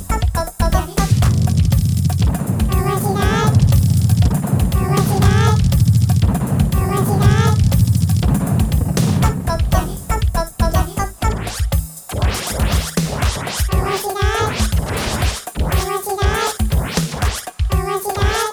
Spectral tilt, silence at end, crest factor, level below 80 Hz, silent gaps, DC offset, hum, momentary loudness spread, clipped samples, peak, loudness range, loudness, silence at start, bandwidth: -5.5 dB/octave; 0 s; 14 dB; -22 dBFS; none; under 0.1%; none; 7 LU; under 0.1%; -2 dBFS; 5 LU; -17 LUFS; 0 s; over 20 kHz